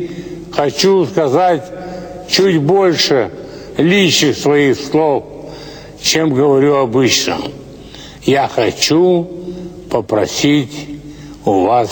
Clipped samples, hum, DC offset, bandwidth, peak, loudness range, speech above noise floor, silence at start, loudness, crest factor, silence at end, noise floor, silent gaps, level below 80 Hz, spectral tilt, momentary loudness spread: under 0.1%; none; under 0.1%; 19.5 kHz; 0 dBFS; 3 LU; 21 dB; 0 s; -13 LUFS; 14 dB; 0 s; -33 dBFS; none; -46 dBFS; -4.5 dB/octave; 19 LU